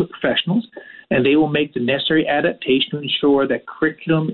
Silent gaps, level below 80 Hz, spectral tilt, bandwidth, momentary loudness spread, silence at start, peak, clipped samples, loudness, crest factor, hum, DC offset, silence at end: none; -54 dBFS; -9.5 dB/octave; 4.3 kHz; 6 LU; 0 s; -6 dBFS; under 0.1%; -18 LUFS; 12 dB; none; under 0.1%; 0 s